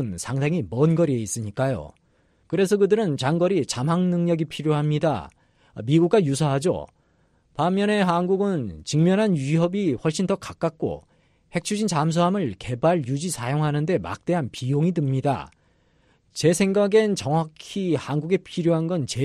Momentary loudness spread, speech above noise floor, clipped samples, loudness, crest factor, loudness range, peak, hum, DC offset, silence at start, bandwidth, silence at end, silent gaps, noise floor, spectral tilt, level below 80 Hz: 9 LU; 41 dB; under 0.1%; -23 LUFS; 16 dB; 2 LU; -6 dBFS; none; under 0.1%; 0 s; 13 kHz; 0 s; none; -63 dBFS; -6 dB/octave; -56 dBFS